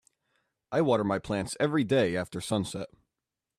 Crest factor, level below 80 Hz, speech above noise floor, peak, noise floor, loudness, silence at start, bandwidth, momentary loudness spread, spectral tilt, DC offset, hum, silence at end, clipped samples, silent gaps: 18 dB; -62 dBFS; 60 dB; -12 dBFS; -88 dBFS; -29 LUFS; 0.7 s; 14.5 kHz; 9 LU; -5.5 dB/octave; under 0.1%; none; 0.75 s; under 0.1%; none